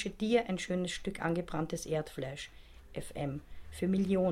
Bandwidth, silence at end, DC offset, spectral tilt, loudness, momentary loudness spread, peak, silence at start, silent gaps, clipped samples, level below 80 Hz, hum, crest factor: 14.5 kHz; 0 s; under 0.1%; -6 dB/octave; -35 LUFS; 15 LU; -16 dBFS; 0 s; none; under 0.1%; -54 dBFS; none; 18 dB